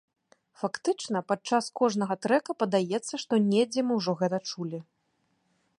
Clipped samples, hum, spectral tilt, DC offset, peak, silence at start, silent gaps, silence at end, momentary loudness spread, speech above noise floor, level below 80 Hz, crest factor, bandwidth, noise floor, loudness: under 0.1%; none; -5 dB/octave; under 0.1%; -10 dBFS; 0.6 s; none; 0.95 s; 10 LU; 46 dB; -78 dBFS; 18 dB; 11.5 kHz; -74 dBFS; -28 LUFS